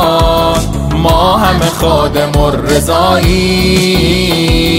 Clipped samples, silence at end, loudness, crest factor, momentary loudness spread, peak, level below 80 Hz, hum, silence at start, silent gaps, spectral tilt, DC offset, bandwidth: under 0.1%; 0 s; -10 LUFS; 10 dB; 3 LU; 0 dBFS; -18 dBFS; none; 0 s; none; -5 dB/octave; under 0.1%; 16.5 kHz